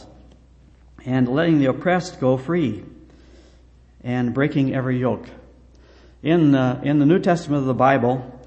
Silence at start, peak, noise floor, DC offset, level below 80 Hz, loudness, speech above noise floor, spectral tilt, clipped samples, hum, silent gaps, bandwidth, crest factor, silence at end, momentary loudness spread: 0 s; -2 dBFS; -50 dBFS; under 0.1%; -50 dBFS; -20 LUFS; 31 dB; -8 dB/octave; under 0.1%; none; none; 8.6 kHz; 18 dB; 0 s; 10 LU